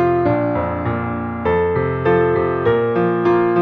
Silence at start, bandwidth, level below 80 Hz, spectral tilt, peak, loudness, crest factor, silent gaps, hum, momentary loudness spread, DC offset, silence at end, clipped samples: 0 s; 4.9 kHz; -42 dBFS; -10 dB/octave; -4 dBFS; -18 LUFS; 12 dB; none; none; 6 LU; under 0.1%; 0 s; under 0.1%